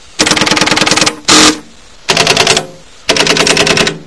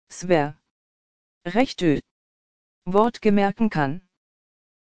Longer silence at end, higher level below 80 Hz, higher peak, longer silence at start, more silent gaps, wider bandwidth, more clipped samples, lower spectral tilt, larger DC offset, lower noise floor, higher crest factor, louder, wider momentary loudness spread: second, 0.05 s vs 0.6 s; first, -38 dBFS vs -52 dBFS; first, 0 dBFS vs -4 dBFS; first, 0.2 s vs 0.05 s; second, none vs 0.71-1.41 s, 2.11-2.82 s; first, 11 kHz vs 9.4 kHz; first, 2% vs under 0.1%; second, -1.5 dB/octave vs -6.5 dB/octave; first, 1% vs under 0.1%; second, -36 dBFS vs under -90 dBFS; second, 10 dB vs 20 dB; first, -7 LUFS vs -22 LUFS; second, 8 LU vs 12 LU